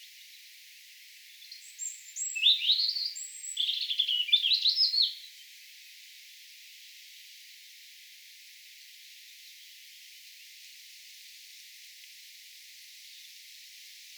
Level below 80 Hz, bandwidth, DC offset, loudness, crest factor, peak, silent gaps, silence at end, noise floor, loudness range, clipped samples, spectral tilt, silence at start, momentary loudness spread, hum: under -90 dBFS; over 20 kHz; under 0.1%; -26 LUFS; 24 dB; -12 dBFS; none; 0 s; -53 dBFS; 23 LU; under 0.1%; 12 dB/octave; 0 s; 26 LU; none